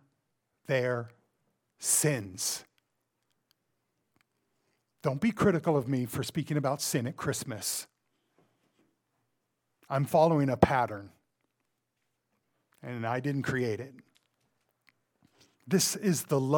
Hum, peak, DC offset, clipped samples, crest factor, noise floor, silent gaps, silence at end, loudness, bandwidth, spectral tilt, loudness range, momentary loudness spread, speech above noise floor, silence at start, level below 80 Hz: none; -4 dBFS; under 0.1%; under 0.1%; 28 dB; -81 dBFS; none; 0 s; -30 LUFS; 19 kHz; -4.5 dB/octave; 7 LU; 12 LU; 52 dB; 0.7 s; -62 dBFS